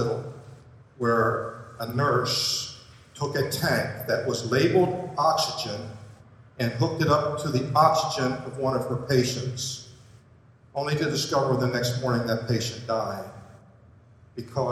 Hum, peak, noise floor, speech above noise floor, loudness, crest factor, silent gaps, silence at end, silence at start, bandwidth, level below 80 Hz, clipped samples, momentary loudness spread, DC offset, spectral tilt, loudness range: none; -4 dBFS; -55 dBFS; 30 dB; -26 LUFS; 22 dB; none; 0 s; 0 s; 15 kHz; -58 dBFS; under 0.1%; 14 LU; under 0.1%; -5 dB/octave; 3 LU